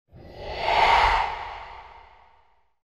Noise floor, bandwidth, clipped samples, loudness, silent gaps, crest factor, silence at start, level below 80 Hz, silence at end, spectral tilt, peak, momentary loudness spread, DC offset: -63 dBFS; 12.5 kHz; under 0.1%; -21 LUFS; none; 18 dB; 0.15 s; -40 dBFS; 1 s; -3 dB/octave; -8 dBFS; 23 LU; under 0.1%